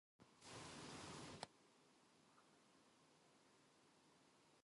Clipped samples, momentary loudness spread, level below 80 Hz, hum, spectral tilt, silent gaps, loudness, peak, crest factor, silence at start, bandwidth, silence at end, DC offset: under 0.1%; 5 LU; -84 dBFS; none; -3.5 dB/octave; none; -57 LUFS; -30 dBFS; 32 dB; 0.2 s; 11.5 kHz; 0 s; under 0.1%